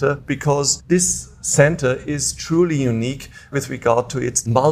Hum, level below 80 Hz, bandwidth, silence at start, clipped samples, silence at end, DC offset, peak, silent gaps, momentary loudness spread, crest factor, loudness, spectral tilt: none; -44 dBFS; 15.5 kHz; 0 s; under 0.1%; 0 s; under 0.1%; 0 dBFS; none; 9 LU; 18 dB; -19 LUFS; -4.5 dB/octave